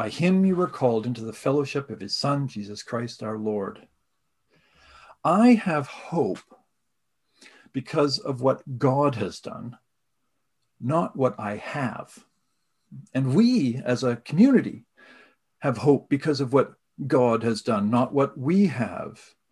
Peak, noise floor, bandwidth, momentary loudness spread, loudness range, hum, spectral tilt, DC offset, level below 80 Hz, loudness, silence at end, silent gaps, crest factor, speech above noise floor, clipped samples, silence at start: -6 dBFS; -80 dBFS; 11.5 kHz; 15 LU; 7 LU; none; -7 dB/octave; under 0.1%; -64 dBFS; -24 LUFS; 0.35 s; none; 18 dB; 56 dB; under 0.1%; 0 s